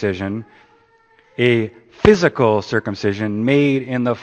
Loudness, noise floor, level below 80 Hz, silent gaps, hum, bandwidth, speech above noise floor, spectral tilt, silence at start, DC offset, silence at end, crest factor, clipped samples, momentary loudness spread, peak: -17 LUFS; -54 dBFS; -42 dBFS; none; none; 8.6 kHz; 37 dB; -6.5 dB/octave; 0 s; under 0.1%; 0 s; 18 dB; under 0.1%; 12 LU; 0 dBFS